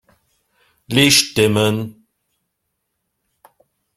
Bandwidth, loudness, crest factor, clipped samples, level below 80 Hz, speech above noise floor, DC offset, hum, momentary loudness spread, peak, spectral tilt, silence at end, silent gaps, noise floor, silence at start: 16 kHz; -15 LUFS; 20 dB; under 0.1%; -52 dBFS; 59 dB; under 0.1%; none; 13 LU; 0 dBFS; -3.5 dB/octave; 2.05 s; none; -74 dBFS; 0.9 s